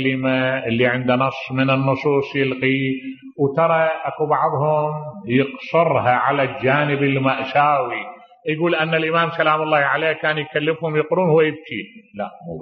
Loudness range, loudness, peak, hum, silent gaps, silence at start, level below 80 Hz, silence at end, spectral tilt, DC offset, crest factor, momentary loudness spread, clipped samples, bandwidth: 1 LU; -19 LUFS; -2 dBFS; none; none; 0 s; -62 dBFS; 0 s; -8.5 dB/octave; under 0.1%; 16 dB; 12 LU; under 0.1%; 6.2 kHz